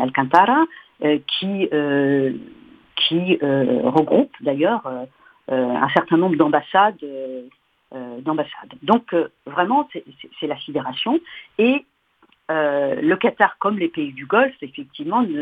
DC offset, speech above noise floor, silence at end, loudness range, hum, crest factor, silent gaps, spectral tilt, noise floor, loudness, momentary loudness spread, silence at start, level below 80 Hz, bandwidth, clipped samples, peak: under 0.1%; 40 dB; 0 s; 4 LU; none; 20 dB; none; -7.5 dB/octave; -59 dBFS; -20 LUFS; 15 LU; 0 s; -66 dBFS; 5.8 kHz; under 0.1%; 0 dBFS